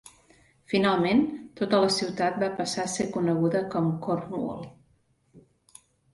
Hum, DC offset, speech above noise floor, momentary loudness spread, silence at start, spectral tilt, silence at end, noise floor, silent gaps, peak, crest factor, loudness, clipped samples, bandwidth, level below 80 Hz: none; under 0.1%; 41 dB; 10 LU; 0.05 s; -5 dB/octave; 0.75 s; -67 dBFS; none; -10 dBFS; 18 dB; -26 LUFS; under 0.1%; 11.5 kHz; -64 dBFS